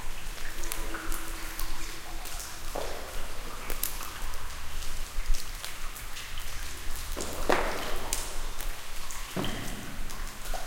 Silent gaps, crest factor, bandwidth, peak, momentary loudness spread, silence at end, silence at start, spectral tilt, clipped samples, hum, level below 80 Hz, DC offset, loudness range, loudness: none; 22 dB; 17 kHz; -6 dBFS; 7 LU; 0 s; 0 s; -2.5 dB/octave; under 0.1%; none; -34 dBFS; under 0.1%; 4 LU; -36 LUFS